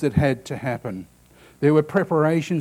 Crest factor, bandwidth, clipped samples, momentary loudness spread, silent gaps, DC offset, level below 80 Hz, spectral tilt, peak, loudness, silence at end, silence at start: 16 dB; 14.5 kHz; under 0.1%; 12 LU; none; under 0.1%; -46 dBFS; -7.5 dB/octave; -6 dBFS; -22 LUFS; 0 s; 0 s